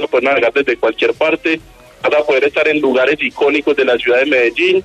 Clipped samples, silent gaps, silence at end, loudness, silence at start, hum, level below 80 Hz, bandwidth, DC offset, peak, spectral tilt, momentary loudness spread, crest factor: under 0.1%; none; 0 s; -13 LUFS; 0 s; none; -52 dBFS; 10 kHz; under 0.1%; -4 dBFS; -4.5 dB/octave; 4 LU; 10 dB